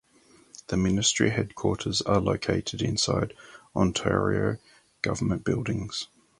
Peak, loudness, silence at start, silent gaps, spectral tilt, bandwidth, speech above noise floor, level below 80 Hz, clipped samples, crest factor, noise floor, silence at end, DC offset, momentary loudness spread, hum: -8 dBFS; -27 LUFS; 0.7 s; none; -4.5 dB/octave; 11.5 kHz; 32 dB; -46 dBFS; under 0.1%; 20 dB; -59 dBFS; 0.35 s; under 0.1%; 10 LU; none